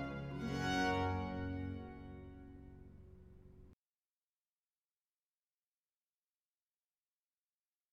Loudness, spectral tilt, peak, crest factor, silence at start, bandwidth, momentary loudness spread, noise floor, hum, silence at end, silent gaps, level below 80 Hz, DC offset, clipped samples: -40 LUFS; -5.5 dB/octave; -24 dBFS; 22 dB; 0 s; 15.5 kHz; 25 LU; under -90 dBFS; none; 4.2 s; none; -60 dBFS; under 0.1%; under 0.1%